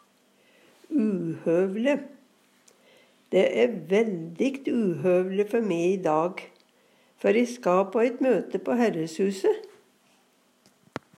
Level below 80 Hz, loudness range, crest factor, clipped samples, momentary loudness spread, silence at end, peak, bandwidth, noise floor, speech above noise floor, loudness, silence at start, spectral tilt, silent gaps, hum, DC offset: -82 dBFS; 2 LU; 18 dB; under 0.1%; 6 LU; 1.5 s; -10 dBFS; 14 kHz; -64 dBFS; 40 dB; -25 LUFS; 0.9 s; -6.5 dB/octave; none; none; under 0.1%